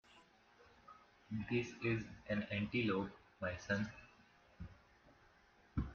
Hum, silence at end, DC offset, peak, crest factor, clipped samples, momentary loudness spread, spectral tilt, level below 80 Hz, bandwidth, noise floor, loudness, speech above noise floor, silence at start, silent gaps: none; 0 s; under 0.1%; -24 dBFS; 20 dB; under 0.1%; 24 LU; -5.5 dB/octave; -60 dBFS; 7 kHz; -69 dBFS; -42 LUFS; 28 dB; 0.15 s; none